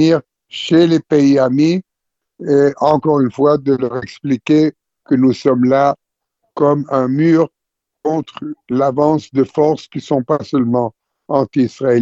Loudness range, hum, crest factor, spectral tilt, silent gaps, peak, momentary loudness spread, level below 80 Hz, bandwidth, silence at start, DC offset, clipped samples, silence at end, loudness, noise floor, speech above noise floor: 3 LU; none; 14 dB; -7.5 dB/octave; none; 0 dBFS; 10 LU; -56 dBFS; 7.8 kHz; 0 s; under 0.1%; under 0.1%; 0 s; -15 LUFS; -77 dBFS; 63 dB